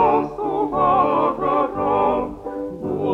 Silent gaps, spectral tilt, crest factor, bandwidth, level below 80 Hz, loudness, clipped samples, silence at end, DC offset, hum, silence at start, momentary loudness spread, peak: none; -8.5 dB/octave; 14 dB; 7.6 kHz; -46 dBFS; -20 LUFS; under 0.1%; 0 s; under 0.1%; none; 0 s; 11 LU; -6 dBFS